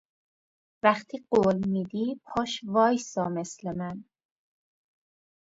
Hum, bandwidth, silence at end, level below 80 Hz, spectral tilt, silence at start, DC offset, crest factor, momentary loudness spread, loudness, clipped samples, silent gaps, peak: none; 8 kHz; 1.55 s; -64 dBFS; -5.5 dB/octave; 0.85 s; under 0.1%; 24 dB; 11 LU; -28 LUFS; under 0.1%; none; -6 dBFS